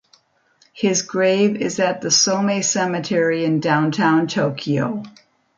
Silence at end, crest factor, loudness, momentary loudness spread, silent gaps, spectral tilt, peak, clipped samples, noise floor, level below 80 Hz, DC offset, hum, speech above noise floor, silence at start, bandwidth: 0.5 s; 16 dB; -18 LUFS; 6 LU; none; -4 dB/octave; -4 dBFS; under 0.1%; -59 dBFS; -66 dBFS; under 0.1%; none; 40 dB; 0.75 s; 10 kHz